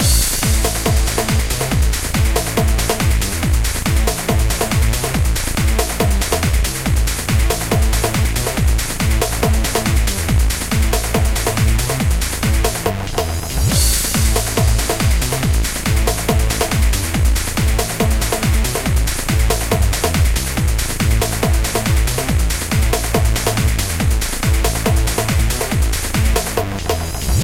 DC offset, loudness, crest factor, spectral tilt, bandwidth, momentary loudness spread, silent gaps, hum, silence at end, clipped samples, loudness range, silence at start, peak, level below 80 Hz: under 0.1%; -17 LUFS; 14 dB; -4 dB/octave; 17 kHz; 2 LU; none; none; 0 s; under 0.1%; 1 LU; 0 s; -2 dBFS; -18 dBFS